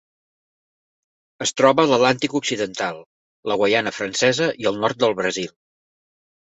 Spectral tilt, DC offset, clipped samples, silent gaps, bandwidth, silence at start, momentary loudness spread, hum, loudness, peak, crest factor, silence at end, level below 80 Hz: -3.5 dB/octave; under 0.1%; under 0.1%; 3.06-3.43 s; 8.2 kHz; 1.4 s; 11 LU; none; -20 LUFS; -2 dBFS; 20 dB; 1.1 s; -62 dBFS